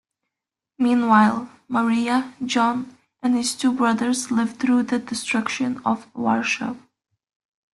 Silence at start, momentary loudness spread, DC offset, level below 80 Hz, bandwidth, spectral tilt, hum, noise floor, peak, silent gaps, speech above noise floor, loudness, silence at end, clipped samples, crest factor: 0.8 s; 9 LU; under 0.1%; -66 dBFS; 12 kHz; -4 dB/octave; none; -86 dBFS; -4 dBFS; none; 66 dB; -22 LUFS; 0.95 s; under 0.1%; 18 dB